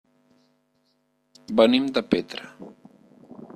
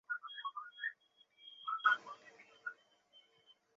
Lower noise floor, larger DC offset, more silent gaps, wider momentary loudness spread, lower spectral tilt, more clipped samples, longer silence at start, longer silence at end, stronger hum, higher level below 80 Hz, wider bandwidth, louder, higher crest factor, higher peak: about the same, -69 dBFS vs -70 dBFS; neither; neither; first, 27 LU vs 23 LU; first, -5.5 dB/octave vs 5 dB/octave; neither; first, 1.5 s vs 0.1 s; second, 0.1 s vs 0.25 s; neither; first, -64 dBFS vs under -90 dBFS; first, 12 kHz vs 7.4 kHz; first, -22 LUFS vs -40 LUFS; about the same, 24 dB vs 26 dB; first, -4 dBFS vs -18 dBFS